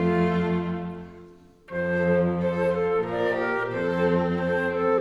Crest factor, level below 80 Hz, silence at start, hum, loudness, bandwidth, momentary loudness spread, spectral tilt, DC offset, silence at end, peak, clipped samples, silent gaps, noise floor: 14 dB; -54 dBFS; 0 s; none; -25 LUFS; 6 kHz; 10 LU; -8.5 dB/octave; under 0.1%; 0 s; -10 dBFS; under 0.1%; none; -49 dBFS